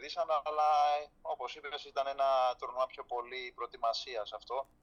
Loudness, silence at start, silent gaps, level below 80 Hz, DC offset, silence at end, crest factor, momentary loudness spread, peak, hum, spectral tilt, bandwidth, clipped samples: -35 LUFS; 0 s; none; -70 dBFS; under 0.1%; 0.2 s; 14 dB; 11 LU; -20 dBFS; none; -1.5 dB/octave; 10 kHz; under 0.1%